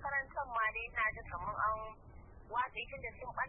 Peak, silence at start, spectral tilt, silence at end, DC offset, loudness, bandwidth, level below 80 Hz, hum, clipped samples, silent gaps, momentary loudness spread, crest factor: -24 dBFS; 0 s; 2.5 dB/octave; 0 s; under 0.1%; -38 LUFS; 3.3 kHz; -56 dBFS; none; under 0.1%; none; 15 LU; 16 dB